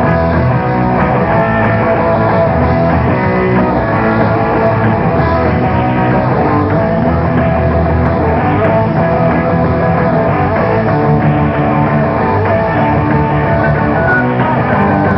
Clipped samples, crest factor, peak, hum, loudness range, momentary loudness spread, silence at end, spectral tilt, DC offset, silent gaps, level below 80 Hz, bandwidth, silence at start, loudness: under 0.1%; 10 dB; 0 dBFS; none; 0 LU; 1 LU; 0 s; -11 dB/octave; 0.2%; none; -26 dBFS; 5.8 kHz; 0 s; -11 LUFS